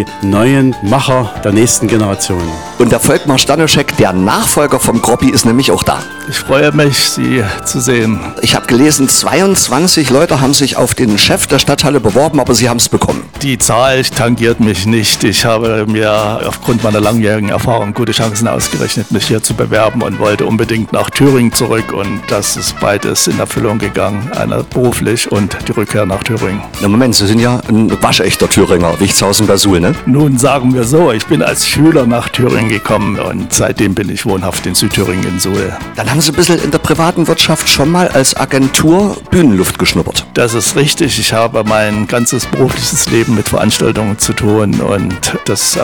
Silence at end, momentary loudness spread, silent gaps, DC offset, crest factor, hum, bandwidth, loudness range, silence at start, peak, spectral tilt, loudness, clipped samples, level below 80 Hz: 0 s; 6 LU; none; under 0.1%; 10 dB; none; over 20 kHz; 3 LU; 0 s; 0 dBFS; -4 dB/octave; -10 LUFS; under 0.1%; -34 dBFS